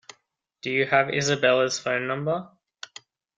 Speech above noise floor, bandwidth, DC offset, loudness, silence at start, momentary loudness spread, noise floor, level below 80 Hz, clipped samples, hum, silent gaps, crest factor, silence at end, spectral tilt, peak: 46 dB; 9.6 kHz; under 0.1%; -23 LUFS; 0.65 s; 21 LU; -70 dBFS; -66 dBFS; under 0.1%; none; none; 20 dB; 0.9 s; -3.5 dB/octave; -6 dBFS